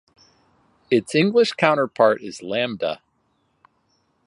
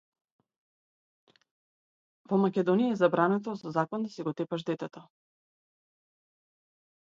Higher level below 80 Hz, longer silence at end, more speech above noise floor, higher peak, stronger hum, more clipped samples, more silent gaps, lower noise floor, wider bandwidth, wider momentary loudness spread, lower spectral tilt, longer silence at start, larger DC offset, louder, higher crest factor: first, -68 dBFS vs -80 dBFS; second, 1.3 s vs 2.05 s; second, 48 dB vs over 61 dB; first, 0 dBFS vs -10 dBFS; neither; neither; neither; second, -67 dBFS vs under -90 dBFS; first, 11.5 kHz vs 7.6 kHz; about the same, 10 LU vs 10 LU; second, -5.5 dB/octave vs -8 dB/octave; second, 0.9 s vs 2.3 s; neither; first, -20 LUFS vs -29 LUFS; about the same, 22 dB vs 22 dB